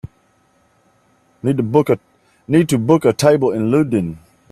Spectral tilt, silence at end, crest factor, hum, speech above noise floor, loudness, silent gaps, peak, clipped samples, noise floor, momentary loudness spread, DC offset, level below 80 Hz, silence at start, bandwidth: -7 dB/octave; 0.35 s; 18 dB; none; 43 dB; -16 LUFS; none; 0 dBFS; under 0.1%; -58 dBFS; 8 LU; under 0.1%; -52 dBFS; 0.05 s; 14.5 kHz